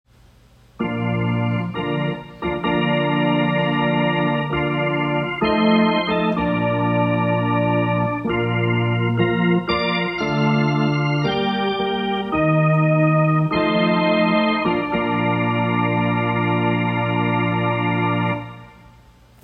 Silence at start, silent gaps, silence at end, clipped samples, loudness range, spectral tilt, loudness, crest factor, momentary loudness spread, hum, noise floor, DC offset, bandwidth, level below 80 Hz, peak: 0.8 s; none; 0.75 s; under 0.1%; 3 LU; -8.5 dB/octave; -19 LUFS; 14 dB; 5 LU; none; -51 dBFS; under 0.1%; 6 kHz; -48 dBFS; -6 dBFS